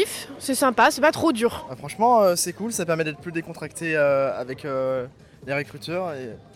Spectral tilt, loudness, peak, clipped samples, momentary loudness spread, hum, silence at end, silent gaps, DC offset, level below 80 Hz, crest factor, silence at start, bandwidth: -4 dB/octave; -23 LUFS; -6 dBFS; under 0.1%; 14 LU; none; 0.15 s; none; under 0.1%; -58 dBFS; 16 dB; 0 s; 17 kHz